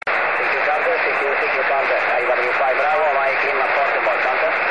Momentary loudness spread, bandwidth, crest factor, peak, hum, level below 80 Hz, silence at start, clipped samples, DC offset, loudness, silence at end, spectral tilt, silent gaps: 1 LU; 10 kHz; 12 dB; -6 dBFS; none; -66 dBFS; 0.05 s; under 0.1%; 0.6%; -17 LUFS; 0 s; -3.5 dB/octave; none